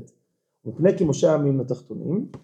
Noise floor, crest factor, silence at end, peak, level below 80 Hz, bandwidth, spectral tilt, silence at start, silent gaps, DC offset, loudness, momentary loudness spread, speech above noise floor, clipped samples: -72 dBFS; 18 dB; 0.05 s; -6 dBFS; -60 dBFS; 9 kHz; -7.5 dB/octave; 0 s; none; under 0.1%; -22 LUFS; 13 LU; 50 dB; under 0.1%